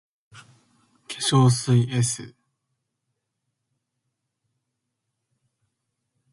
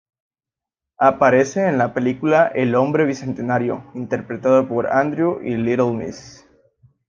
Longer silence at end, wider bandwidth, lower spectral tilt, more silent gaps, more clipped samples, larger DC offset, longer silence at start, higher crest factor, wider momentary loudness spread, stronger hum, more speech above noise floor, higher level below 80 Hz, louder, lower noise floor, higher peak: first, 4.05 s vs 0.8 s; first, 11.5 kHz vs 7.4 kHz; second, -5 dB/octave vs -7 dB/octave; neither; neither; neither; second, 0.35 s vs 1 s; about the same, 22 dB vs 18 dB; first, 13 LU vs 10 LU; neither; second, 60 dB vs 71 dB; about the same, -62 dBFS vs -60 dBFS; about the same, -21 LUFS vs -19 LUFS; second, -80 dBFS vs -89 dBFS; second, -6 dBFS vs -2 dBFS